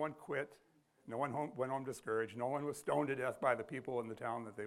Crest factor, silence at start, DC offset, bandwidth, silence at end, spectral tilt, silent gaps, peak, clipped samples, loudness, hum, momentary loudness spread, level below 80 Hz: 22 dB; 0 s; under 0.1%; 16 kHz; 0 s; -6 dB/octave; none; -20 dBFS; under 0.1%; -40 LUFS; none; 6 LU; -80 dBFS